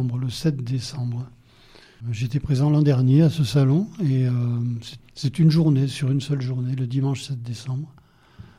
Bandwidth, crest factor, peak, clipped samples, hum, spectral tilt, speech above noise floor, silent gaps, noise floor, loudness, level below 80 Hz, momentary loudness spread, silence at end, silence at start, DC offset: 12 kHz; 14 dB; -8 dBFS; under 0.1%; none; -7.5 dB/octave; 29 dB; none; -50 dBFS; -22 LUFS; -50 dBFS; 14 LU; 0.15 s; 0 s; under 0.1%